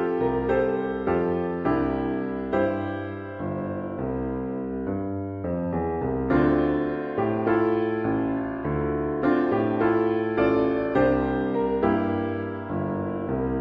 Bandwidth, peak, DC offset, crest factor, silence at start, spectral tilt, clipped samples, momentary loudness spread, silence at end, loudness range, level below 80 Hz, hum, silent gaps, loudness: 5.2 kHz; -10 dBFS; under 0.1%; 16 dB; 0 s; -10 dB/octave; under 0.1%; 8 LU; 0 s; 6 LU; -44 dBFS; none; none; -25 LUFS